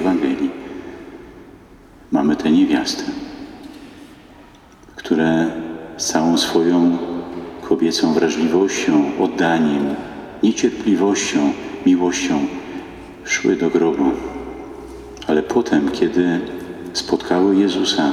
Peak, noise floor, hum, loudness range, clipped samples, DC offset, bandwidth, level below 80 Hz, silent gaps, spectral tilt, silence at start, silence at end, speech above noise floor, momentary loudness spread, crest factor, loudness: -2 dBFS; -45 dBFS; none; 4 LU; under 0.1%; under 0.1%; 14 kHz; -50 dBFS; none; -4.5 dB/octave; 0 s; 0 s; 28 dB; 18 LU; 16 dB; -18 LUFS